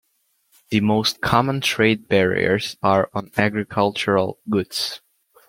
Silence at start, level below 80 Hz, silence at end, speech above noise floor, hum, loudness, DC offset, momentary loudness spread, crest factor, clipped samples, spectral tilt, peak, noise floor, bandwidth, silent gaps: 0.7 s; -52 dBFS; 0.5 s; 47 dB; none; -20 LUFS; under 0.1%; 6 LU; 20 dB; under 0.1%; -5 dB/octave; -2 dBFS; -67 dBFS; 16.5 kHz; none